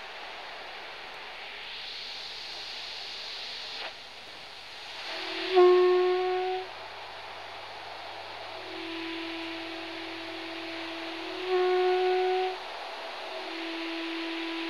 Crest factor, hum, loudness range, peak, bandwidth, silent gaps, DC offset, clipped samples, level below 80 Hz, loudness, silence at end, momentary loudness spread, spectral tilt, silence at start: 22 dB; none; 10 LU; -10 dBFS; 11 kHz; none; 0.2%; under 0.1%; -72 dBFS; -31 LUFS; 0 s; 15 LU; -3.5 dB/octave; 0 s